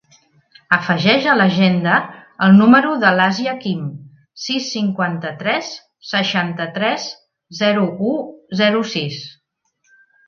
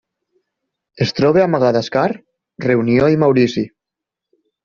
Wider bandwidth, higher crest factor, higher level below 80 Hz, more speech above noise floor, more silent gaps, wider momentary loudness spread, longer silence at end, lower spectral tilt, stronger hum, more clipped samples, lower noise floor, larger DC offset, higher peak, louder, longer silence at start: about the same, 7 kHz vs 7.2 kHz; about the same, 18 dB vs 14 dB; second, -62 dBFS vs -52 dBFS; second, 51 dB vs 69 dB; neither; first, 16 LU vs 11 LU; about the same, 1 s vs 0.95 s; about the same, -5.5 dB/octave vs -5.5 dB/octave; neither; neither; second, -67 dBFS vs -84 dBFS; neither; about the same, 0 dBFS vs -2 dBFS; about the same, -16 LUFS vs -15 LUFS; second, 0.7 s vs 0.95 s